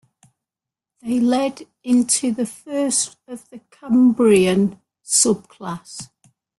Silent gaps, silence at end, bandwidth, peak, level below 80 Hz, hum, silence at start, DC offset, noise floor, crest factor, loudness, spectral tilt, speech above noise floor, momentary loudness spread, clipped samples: none; 0.55 s; 12.5 kHz; -2 dBFS; -60 dBFS; none; 1.05 s; under 0.1%; -88 dBFS; 18 dB; -18 LUFS; -4 dB/octave; 69 dB; 21 LU; under 0.1%